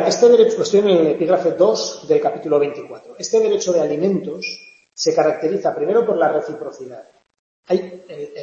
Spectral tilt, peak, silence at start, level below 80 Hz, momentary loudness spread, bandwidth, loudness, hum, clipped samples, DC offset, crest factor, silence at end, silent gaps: -4.5 dB/octave; -2 dBFS; 0 s; -66 dBFS; 19 LU; 7.8 kHz; -17 LUFS; none; under 0.1%; under 0.1%; 16 dB; 0 s; 7.39-7.63 s